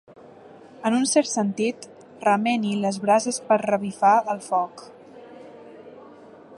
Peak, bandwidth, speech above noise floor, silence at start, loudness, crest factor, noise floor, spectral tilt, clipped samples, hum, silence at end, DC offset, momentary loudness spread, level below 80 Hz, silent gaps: -6 dBFS; 11.5 kHz; 25 dB; 0.45 s; -22 LUFS; 18 dB; -46 dBFS; -4 dB/octave; under 0.1%; none; 0 s; under 0.1%; 24 LU; -74 dBFS; none